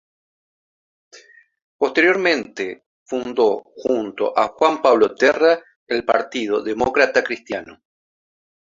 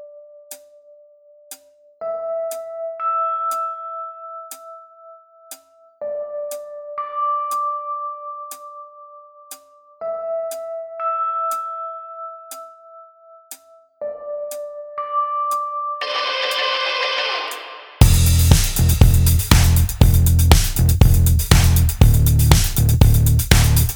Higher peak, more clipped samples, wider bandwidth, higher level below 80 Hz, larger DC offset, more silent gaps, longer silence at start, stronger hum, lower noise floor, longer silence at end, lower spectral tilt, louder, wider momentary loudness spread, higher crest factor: about the same, -2 dBFS vs 0 dBFS; neither; second, 7.6 kHz vs over 20 kHz; second, -58 dBFS vs -22 dBFS; neither; first, 1.64-1.79 s, 2.86-3.06 s, 5.76-5.87 s vs none; first, 1.15 s vs 0 s; neither; about the same, -48 dBFS vs -49 dBFS; first, 1 s vs 0 s; about the same, -4 dB/octave vs -4.5 dB/octave; about the same, -19 LUFS vs -18 LUFS; second, 13 LU vs 24 LU; about the same, 20 dB vs 18 dB